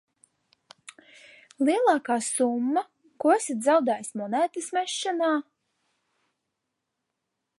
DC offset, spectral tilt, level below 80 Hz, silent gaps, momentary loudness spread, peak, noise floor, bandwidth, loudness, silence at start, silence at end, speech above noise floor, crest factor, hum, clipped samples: under 0.1%; -3 dB/octave; -86 dBFS; none; 7 LU; -8 dBFS; -82 dBFS; 11.5 kHz; -25 LUFS; 1.6 s; 2.15 s; 58 dB; 20 dB; none; under 0.1%